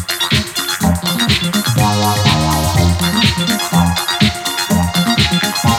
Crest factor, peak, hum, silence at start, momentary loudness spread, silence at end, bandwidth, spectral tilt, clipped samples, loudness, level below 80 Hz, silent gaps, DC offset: 14 dB; 0 dBFS; none; 0 s; 3 LU; 0 s; 18 kHz; -4 dB/octave; under 0.1%; -14 LUFS; -30 dBFS; none; under 0.1%